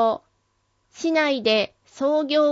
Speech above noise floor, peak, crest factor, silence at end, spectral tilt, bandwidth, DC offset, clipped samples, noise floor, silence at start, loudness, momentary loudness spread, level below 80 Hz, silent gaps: 48 dB; -6 dBFS; 16 dB; 0 s; -3.5 dB/octave; 7.8 kHz; under 0.1%; under 0.1%; -69 dBFS; 0 s; -22 LUFS; 10 LU; -68 dBFS; none